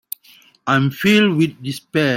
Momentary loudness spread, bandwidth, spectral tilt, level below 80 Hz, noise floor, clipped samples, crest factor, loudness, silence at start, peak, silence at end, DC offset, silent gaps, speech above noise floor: 17 LU; 16.5 kHz; -5.5 dB/octave; -58 dBFS; -50 dBFS; under 0.1%; 16 dB; -17 LUFS; 0.65 s; -2 dBFS; 0 s; under 0.1%; none; 34 dB